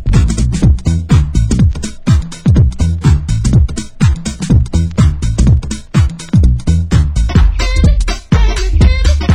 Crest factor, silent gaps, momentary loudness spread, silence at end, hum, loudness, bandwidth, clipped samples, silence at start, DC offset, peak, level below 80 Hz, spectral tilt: 10 dB; none; 3 LU; 0 s; none; -13 LUFS; 11 kHz; under 0.1%; 0 s; under 0.1%; 0 dBFS; -12 dBFS; -6.5 dB/octave